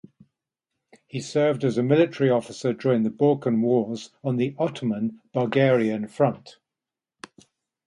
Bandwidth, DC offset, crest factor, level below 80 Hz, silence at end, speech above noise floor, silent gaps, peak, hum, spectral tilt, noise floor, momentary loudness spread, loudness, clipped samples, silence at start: 11 kHz; under 0.1%; 18 dB; -70 dBFS; 1.35 s; 66 dB; none; -6 dBFS; none; -7 dB/octave; -89 dBFS; 9 LU; -23 LUFS; under 0.1%; 1.15 s